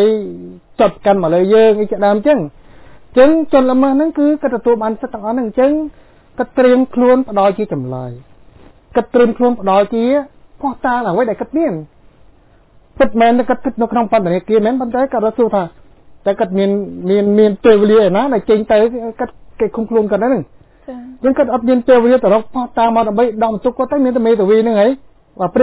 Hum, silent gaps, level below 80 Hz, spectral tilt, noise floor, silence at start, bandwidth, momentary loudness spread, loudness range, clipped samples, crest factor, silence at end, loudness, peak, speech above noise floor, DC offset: none; none; -46 dBFS; -11 dB/octave; -47 dBFS; 0 s; 4 kHz; 12 LU; 4 LU; under 0.1%; 14 dB; 0 s; -14 LUFS; 0 dBFS; 34 dB; under 0.1%